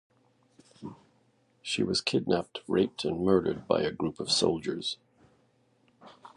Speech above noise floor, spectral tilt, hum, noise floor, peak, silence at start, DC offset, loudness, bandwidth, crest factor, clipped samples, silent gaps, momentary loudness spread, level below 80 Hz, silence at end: 39 dB; -4.5 dB/octave; none; -68 dBFS; -10 dBFS; 0.8 s; under 0.1%; -29 LUFS; 11 kHz; 22 dB; under 0.1%; none; 17 LU; -60 dBFS; 0.1 s